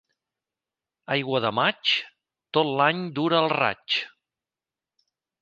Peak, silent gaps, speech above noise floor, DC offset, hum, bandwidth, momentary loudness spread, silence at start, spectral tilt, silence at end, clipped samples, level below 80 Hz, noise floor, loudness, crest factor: -6 dBFS; none; over 66 dB; under 0.1%; none; 8.8 kHz; 6 LU; 1.1 s; -5.5 dB/octave; 1.35 s; under 0.1%; -72 dBFS; under -90 dBFS; -24 LUFS; 22 dB